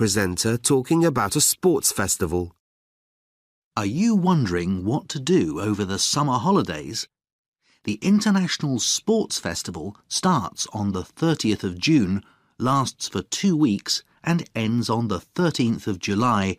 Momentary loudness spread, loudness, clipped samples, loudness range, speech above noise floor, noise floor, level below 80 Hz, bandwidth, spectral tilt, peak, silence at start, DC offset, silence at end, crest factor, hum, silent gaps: 9 LU; -22 LUFS; under 0.1%; 2 LU; over 68 dB; under -90 dBFS; -52 dBFS; 15.5 kHz; -4.5 dB/octave; -6 dBFS; 0 s; under 0.1%; 0.05 s; 16 dB; none; 2.60-3.71 s, 7.32-7.52 s